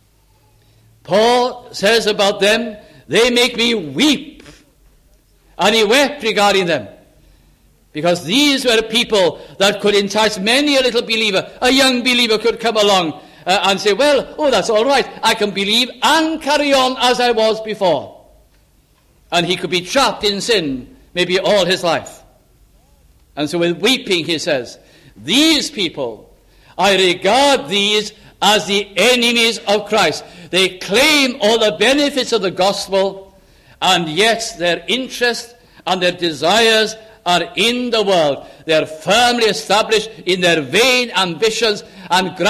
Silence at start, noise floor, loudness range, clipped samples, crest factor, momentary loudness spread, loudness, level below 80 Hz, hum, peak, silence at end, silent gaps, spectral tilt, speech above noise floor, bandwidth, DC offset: 1.1 s; -54 dBFS; 4 LU; under 0.1%; 16 dB; 8 LU; -14 LUFS; -50 dBFS; none; 0 dBFS; 0 s; none; -3 dB/octave; 39 dB; 16 kHz; under 0.1%